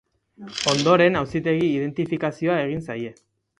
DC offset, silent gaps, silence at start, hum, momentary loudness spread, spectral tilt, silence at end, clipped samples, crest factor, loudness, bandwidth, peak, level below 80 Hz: under 0.1%; none; 0.4 s; none; 15 LU; -5 dB/octave; 0.5 s; under 0.1%; 20 dB; -22 LUFS; 11 kHz; -4 dBFS; -56 dBFS